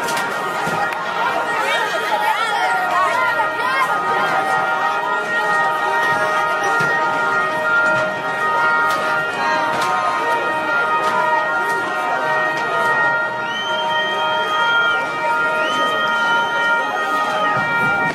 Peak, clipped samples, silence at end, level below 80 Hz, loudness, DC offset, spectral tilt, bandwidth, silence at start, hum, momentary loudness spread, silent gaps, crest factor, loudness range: -6 dBFS; under 0.1%; 0 s; -62 dBFS; -17 LUFS; under 0.1%; -3 dB/octave; 16 kHz; 0 s; none; 4 LU; none; 12 dB; 1 LU